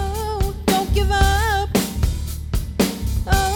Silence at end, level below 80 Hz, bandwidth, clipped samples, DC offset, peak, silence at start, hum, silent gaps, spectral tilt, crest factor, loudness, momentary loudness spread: 0 s; -24 dBFS; 18 kHz; under 0.1%; under 0.1%; -2 dBFS; 0 s; none; none; -5 dB/octave; 16 dB; -21 LUFS; 8 LU